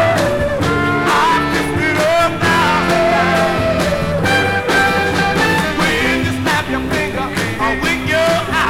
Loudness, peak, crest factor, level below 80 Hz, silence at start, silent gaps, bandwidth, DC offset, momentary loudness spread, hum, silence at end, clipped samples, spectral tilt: -14 LUFS; -2 dBFS; 14 dB; -34 dBFS; 0 s; none; 17.5 kHz; under 0.1%; 4 LU; none; 0 s; under 0.1%; -4.5 dB/octave